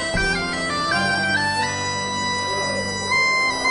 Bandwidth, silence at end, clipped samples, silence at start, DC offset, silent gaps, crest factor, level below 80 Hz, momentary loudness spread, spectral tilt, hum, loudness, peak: 11 kHz; 0 s; under 0.1%; 0 s; under 0.1%; none; 14 dB; -40 dBFS; 5 LU; -2.5 dB/octave; none; -20 LUFS; -8 dBFS